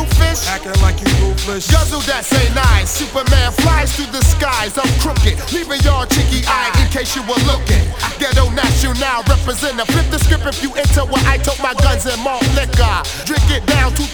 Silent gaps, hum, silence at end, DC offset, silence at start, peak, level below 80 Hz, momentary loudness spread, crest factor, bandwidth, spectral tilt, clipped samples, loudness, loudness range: none; none; 0 s; under 0.1%; 0 s; 0 dBFS; -16 dBFS; 4 LU; 14 dB; over 20 kHz; -4.5 dB/octave; under 0.1%; -15 LUFS; 1 LU